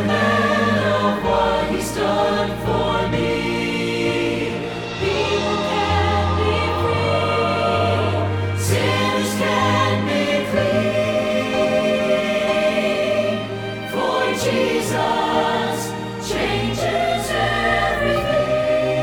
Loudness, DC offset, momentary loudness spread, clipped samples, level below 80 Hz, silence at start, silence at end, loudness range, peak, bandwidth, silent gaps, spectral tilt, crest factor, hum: -19 LUFS; under 0.1%; 4 LU; under 0.1%; -40 dBFS; 0 s; 0 s; 2 LU; -6 dBFS; 19 kHz; none; -5 dB/octave; 14 dB; none